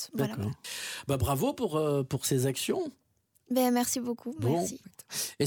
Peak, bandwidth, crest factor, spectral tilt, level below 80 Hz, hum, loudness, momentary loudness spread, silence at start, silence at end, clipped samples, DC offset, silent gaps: -14 dBFS; 19.5 kHz; 16 dB; -5 dB/octave; -54 dBFS; none; -31 LUFS; 9 LU; 0 s; 0 s; under 0.1%; under 0.1%; none